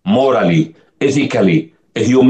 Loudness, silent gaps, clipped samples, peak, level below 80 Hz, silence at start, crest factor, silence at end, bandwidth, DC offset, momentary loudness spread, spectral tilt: -14 LUFS; none; under 0.1%; 0 dBFS; -54 dBFS; 0.05 s; 12 dB; 0 s; 9 kHz; under 0.1%; 8 LU; -6.5 dB/octave